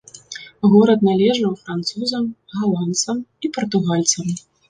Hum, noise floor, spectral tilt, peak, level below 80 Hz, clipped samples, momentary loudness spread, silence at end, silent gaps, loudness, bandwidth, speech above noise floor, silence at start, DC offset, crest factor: none; -38 dBFS; -5 dB/octave; -2 dBFS; -60 dBFS; under 0.1%; 13 LU; 0.3 s; none; -19 LUFS; 10 kHz; 20 dB; 0.15 s; under 0.1%; 16 dB